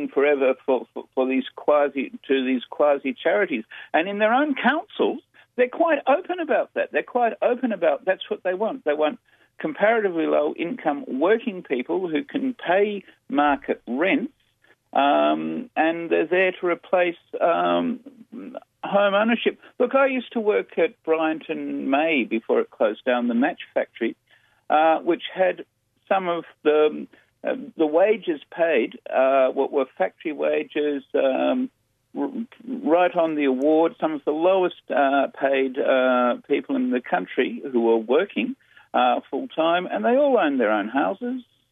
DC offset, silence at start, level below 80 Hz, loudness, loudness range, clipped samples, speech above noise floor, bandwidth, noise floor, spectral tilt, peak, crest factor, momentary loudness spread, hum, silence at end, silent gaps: under 0.1%; 0 s; -72 dBFS; -23 LUFS; 2 LU; under 0.1%; 39 dB; 3.9 kHz; -61 dBFS; -7.5 dB/octave; -6 dBFS; 16 dB; 10 LU; none; 0.3 s; none